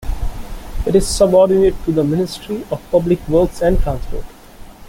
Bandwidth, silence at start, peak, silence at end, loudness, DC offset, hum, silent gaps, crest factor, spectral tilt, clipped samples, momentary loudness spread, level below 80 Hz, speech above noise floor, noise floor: 17 kHz; 0 s; -2 dBFS; 0 s; -16 LUFS; under 0.1%; none; none; 14 dB; -6 dB/octave; under 0.1%; 17 LU; -26 dBFS; 22 dB; -37 dBFS